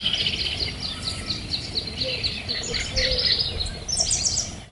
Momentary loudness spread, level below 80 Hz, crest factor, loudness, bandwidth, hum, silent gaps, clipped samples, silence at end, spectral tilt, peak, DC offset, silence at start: 8 LU; -38 dBFS; 18 dB; -24 LUFS; 11.5 kHz; none; none; under 0.1%; 0 s; -1.5 dB/octave; -8 dBFS; under 0.1%; 0 s